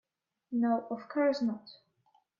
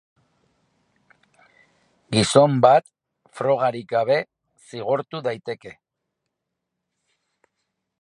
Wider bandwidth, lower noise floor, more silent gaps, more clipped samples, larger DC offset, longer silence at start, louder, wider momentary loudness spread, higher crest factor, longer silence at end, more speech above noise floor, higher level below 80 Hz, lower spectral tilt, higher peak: second, 7.2 kHz vs 11.5 kHz; second, -72 dBFS vs -81 dBFS; neither; neither; neither; second, 0.5 s vs 2.1 s; second, -32 LUFS vs -20 LUFS; second, 8 LU vs 18 LU; second, 16 dB vs 24 dB; second, 0.7 s vs 2.3 s; second, 40 dB vs 61 dB; second, -82 dBFS vs -62 dBFS; first, -6.5 dB/octave vs -5 dB/octave; second, -18 dBFS vs 0 dBFS